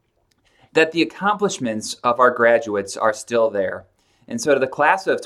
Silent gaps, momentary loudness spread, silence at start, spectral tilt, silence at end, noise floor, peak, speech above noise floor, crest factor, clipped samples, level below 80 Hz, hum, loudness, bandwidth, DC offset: none; 9 LU; 0.75 s; -4 dB/octave; 0 s; -64 dBFS; 0 dBFS; 45 dB; 20 dB; under 0.1%; -64 dBFS; none; -19 LUFS; 13.5 kHz; under 0.1%